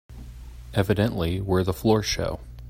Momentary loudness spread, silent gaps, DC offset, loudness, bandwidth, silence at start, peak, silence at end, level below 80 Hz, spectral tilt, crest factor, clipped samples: 21 LU; none; under 0.1%; -25 LUFS; 16 kHz; 0.1 s; -6 dBFS; 0 s; -40 dBFS; -6 dB/octave; 20 dB; under 0.1%